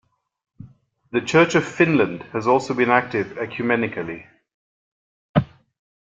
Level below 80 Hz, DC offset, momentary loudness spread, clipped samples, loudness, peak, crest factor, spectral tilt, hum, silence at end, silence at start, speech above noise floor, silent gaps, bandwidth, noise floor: -58 dBFS; under 0.1%; 12 LU; under 0.1%; -20 LUFS; -2 dBFS; 20 dB; -6 dB/octave; none; 0.6 s; 0.6 s; 30 dB; 4.54-5.34 s; 9.2 kHz; -50 dBFS